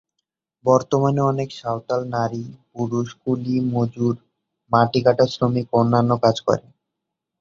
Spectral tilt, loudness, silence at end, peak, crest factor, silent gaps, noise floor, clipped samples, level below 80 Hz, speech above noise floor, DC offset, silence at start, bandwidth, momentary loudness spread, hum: -7.5 dB/octave; -21 LUFS; 0.8 s; -2 dBFS; 20 dB; none; -82 dBFS; under 0.1%; -56 dBFS; 62 dB; under 0.1%; 0.65 s; 7.6 kHz; 9 LU; none